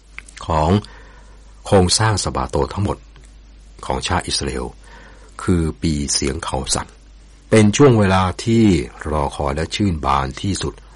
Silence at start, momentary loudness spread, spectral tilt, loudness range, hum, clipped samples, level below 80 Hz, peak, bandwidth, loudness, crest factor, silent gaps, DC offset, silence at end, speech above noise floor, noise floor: 0.15 s; 13 LU; -5 dB/octave; 7 LU; none; under 0.1%; -32 dBFS; -2 dBFS; 11.5 kHz; -18 LUFS; 16 dB; none; under 0.1%; 0.15 s; 26 dB; -43 dBFS